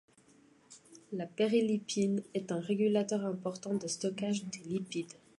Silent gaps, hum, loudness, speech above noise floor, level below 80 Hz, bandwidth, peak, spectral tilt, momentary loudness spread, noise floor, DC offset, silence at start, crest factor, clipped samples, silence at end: none; none; -34 LUFS; 30 dB; -80 dBFS; 11.5 kHz; -18 dBFS; -5.5 dB/octave; 11 LU; -64 dBFS; under 0.1%; 0.7 s; 16 dB; under 0.1%; 0.25 s